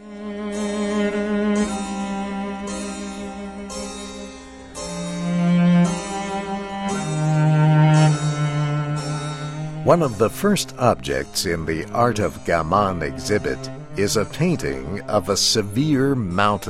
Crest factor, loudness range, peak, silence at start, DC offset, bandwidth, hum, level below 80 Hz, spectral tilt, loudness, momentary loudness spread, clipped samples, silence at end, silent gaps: 20 dB; 7 LU; -2 dBFS; 0 s; under 0.1%; 14.5 kHz; none; -44 dBFS; -5.5 dB/octave; -21 LUFS; 14 LU; under 0.1%; 0 s; none